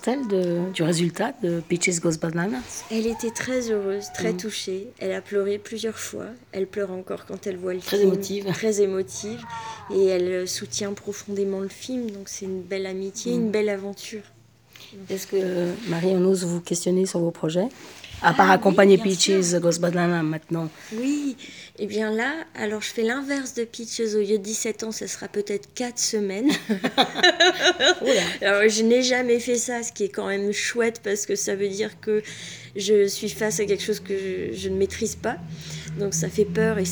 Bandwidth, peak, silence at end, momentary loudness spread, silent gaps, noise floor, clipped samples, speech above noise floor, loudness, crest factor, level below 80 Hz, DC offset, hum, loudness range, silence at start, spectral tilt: over 20 kHz; -2 dBFS; 0 s; 13 LU; none; -50 dBFS; under 0.1%; 26 dB; -24 LUFS; 22 dB; -60 dBFS; under 0.1%; none; 8 LU; 0 s; -4 dB/octave